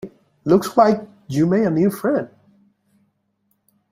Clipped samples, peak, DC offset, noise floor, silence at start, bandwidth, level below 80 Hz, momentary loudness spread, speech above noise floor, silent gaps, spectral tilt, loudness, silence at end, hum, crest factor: under 0.1%; -2 dBFS; under 0.1%; -69 dBFS; 0.05 s; 16 kHz; -60 dBFS; 14 LU; 52 dB; none; -7.5 dB/octave; -19 LUFS; 1.65 s; none; 18 dB